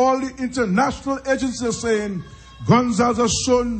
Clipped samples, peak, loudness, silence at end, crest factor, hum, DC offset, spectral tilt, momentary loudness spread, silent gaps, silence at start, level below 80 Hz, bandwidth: under 0.1%; -4 dBFS; -20 LUFS; 0 s; 16 dB; none; under 0.1%; -5 dB/octave; 11 LU; none; 0 s; -42 dBFS; 8.8 kHz